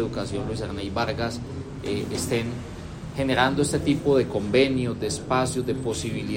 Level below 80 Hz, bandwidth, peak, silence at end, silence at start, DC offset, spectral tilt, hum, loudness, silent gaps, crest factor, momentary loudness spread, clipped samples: -46 dBFS; 16.5 kHz; -8 dBFS; 0 s; 0 s; under 0.1%; -5 dB/octave; none; -25 LUFS; none; 18 dB; 12 LU; under 0.1%